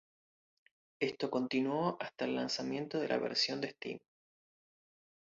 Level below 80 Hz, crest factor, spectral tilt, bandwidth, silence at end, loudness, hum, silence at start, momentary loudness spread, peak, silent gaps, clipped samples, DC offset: -80 dBFS; 20 dB; -3 dB/octave; 7.4 kHz; 1.4 s; -36 LUFS; none; 1 s; 8 LU; -18 dBFS; none; under 0.1%; under 0.1%